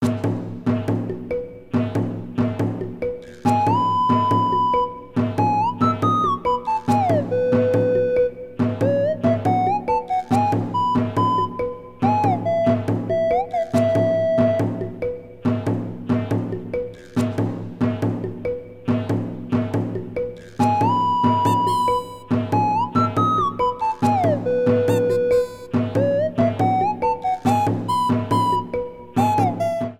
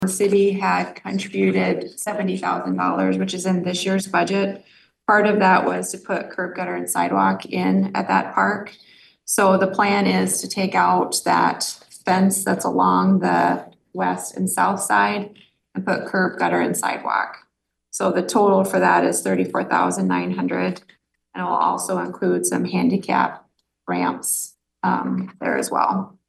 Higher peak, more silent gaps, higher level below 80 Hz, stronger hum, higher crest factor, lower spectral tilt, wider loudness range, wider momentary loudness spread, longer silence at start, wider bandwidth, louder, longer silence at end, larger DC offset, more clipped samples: about the same, -6 dBFS vs -4 dBFS; neither; first, -50 dBFS vs -68 dBFS; neither; about the same, 16 dB vs 16 dB; first, -8 dB/octave vs -4.5 dB/octave; about the same, 5 LU vs 3 LU; about the same, 9 LU vs 10 LU; about the same, 0 s vs 0 s; first, 15 kHz vs 12.5 kHz; about the same, -21 LUFS vs -20 LUFS; second, 0.05 s vs 0.2 s; neither; neither